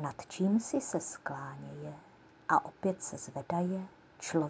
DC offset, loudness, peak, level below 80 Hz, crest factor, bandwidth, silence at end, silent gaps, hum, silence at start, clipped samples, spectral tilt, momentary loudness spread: under 0.1%; -35 LUFS; -14 dBFS; -72 dBFS; 22 dB; 8 kHz; 0 s; none; none; 0 s; under 0.1%; -5.5 dB/octave; 14 LU